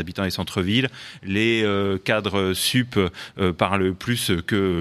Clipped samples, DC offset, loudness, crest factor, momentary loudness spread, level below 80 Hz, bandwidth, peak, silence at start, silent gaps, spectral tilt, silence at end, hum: under 0.1%; under 0.1%; -22 LUFS; 20 dB; 6 LU; -50 dBFS; 15.5 kHz; -2 dBFS; 0 s; none; -5 dB/octave; 0 s; none